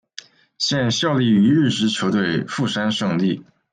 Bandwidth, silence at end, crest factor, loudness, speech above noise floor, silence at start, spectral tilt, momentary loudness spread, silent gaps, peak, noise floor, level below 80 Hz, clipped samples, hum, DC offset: 9.6 kHz; 0.3 s; 14 dB; -19 LUFS; 24 dB; 0.6 s; -5 dB/octave; 8 LU; none; -6 dBFS; -43 dBFS; -60 dBFS; under 0.1%; none; under 0.1%